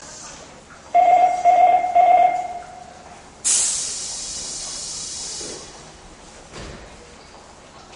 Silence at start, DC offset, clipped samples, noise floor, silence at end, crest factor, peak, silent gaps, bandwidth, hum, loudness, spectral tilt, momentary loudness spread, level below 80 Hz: 0 s; under 0.1%; under 0.1%; -44 dBFS; 0 s; 16 dB; -6 dBFS; none; 11 kHz; none; -18 LUFS; -0.5 dB/octave; 24 LU; -52 dBFS